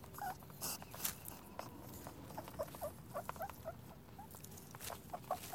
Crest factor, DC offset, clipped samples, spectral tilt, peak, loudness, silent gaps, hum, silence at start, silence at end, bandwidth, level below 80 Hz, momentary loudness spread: 30 dB; under 0.1%; under 0.1%; -3.5 dB/octave; -18 dBFS; -48 LUFS; none; none; 0 s; 0 s; 17 kHz; -66 dBFS; 11 LU